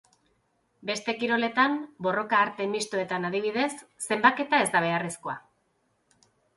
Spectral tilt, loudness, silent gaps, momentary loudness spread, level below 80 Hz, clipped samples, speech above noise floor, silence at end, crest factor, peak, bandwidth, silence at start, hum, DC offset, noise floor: -3.5 dB/octave; -26 LUFS; none; 11 LU; -74 dBFS; under 0.1%; 45 dB; 1.15 s; 22 dB; -6 dBFS; 12 kHz; 0.85 s; none; under 0.1%; -72 dBFS